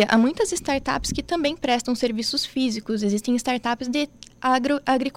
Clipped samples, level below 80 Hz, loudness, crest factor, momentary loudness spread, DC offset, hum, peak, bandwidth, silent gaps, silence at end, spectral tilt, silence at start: under 0.1%; -46 dBFS; -23 LUFS; 16 dB; 5 LU; under 0.1%; none; -6 dBFS; 16 kHz; none; 0.05 s; -3.5 dB/octave; 0 s